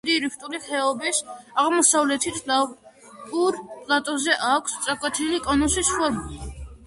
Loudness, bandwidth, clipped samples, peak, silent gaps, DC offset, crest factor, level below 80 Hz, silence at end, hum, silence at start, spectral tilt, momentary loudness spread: -22 LUFS; 11.5 kHz; under 0.1%; -4 dBFS; none; under 0.1%; 20 dB; -44 dBFS; 0 s; none; 0.05 s; -2 dB/octave; 13 LU